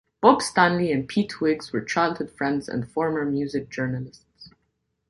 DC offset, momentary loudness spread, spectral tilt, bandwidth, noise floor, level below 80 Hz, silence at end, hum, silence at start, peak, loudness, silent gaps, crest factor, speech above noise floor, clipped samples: under 0.1%; 10 LU; -5.5 dB/octave; 11.5 kHz; -74 dBFS; -58 dBFS; 0.6 s; none; 0.2 s; -2 dBFS; -24 LUFS; none; 22 dB; 51 dB; under 0.1%